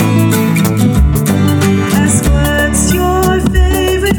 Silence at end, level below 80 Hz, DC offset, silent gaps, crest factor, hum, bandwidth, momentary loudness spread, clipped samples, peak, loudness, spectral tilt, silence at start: 0 s; -18 dBFS; under 0.1%; none; 10 dB; none; 20 kHz; 1 LU; under 0.1%; 0 dBFS; -11 LUFS; -5.5 dB/octave; 0 s